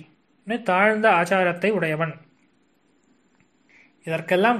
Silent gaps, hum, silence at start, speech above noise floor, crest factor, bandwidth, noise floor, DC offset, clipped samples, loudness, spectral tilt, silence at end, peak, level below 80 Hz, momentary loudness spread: none; none; 0.45 s; 43 dB; 20 dB; 13 kHz; -64 dBFS; under 0.1%; under 0.1%; -21 LUFS; -6 dB/octave; 0 s; -4 dBFS; -72 dBFS; 13 LU